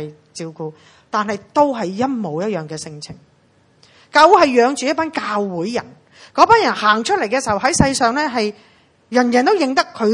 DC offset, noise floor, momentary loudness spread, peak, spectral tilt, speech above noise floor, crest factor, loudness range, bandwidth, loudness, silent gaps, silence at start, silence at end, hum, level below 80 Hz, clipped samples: under 0.1%; -55 dBFS; 18 LU; 0 dBFS; -4 dB/octave; 39 dB; 18 dB; 7 LU; 11.5 kHz; -16 LUFS; none; 0 s; 0 s; none; -46 dBFS; under 0.1%